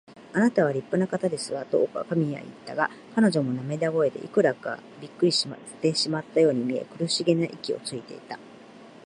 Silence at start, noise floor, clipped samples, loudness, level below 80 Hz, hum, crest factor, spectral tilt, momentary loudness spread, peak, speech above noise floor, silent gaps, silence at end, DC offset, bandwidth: 0.1 s; -47 dBFS; under 0.1%; -26 LUFS; -72 dBFS; none; 18 dB; -5 dB/octave; 13 LU; -8 dBFS; 22 dB; none; 0.15 s; under 0.1%; 11.5 kHz